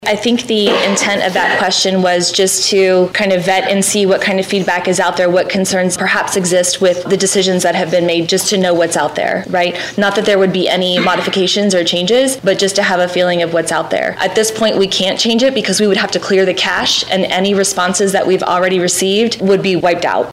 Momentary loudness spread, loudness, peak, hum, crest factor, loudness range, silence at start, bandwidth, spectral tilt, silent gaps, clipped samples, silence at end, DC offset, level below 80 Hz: 3 LU; -12 LUFS; -4 dBFS; none; 10 dB; 1 LU; 0 s; 16 kHz; -3 dB/octave; none; under 0.1%; 0 s; under 0.1%; -52 dBFS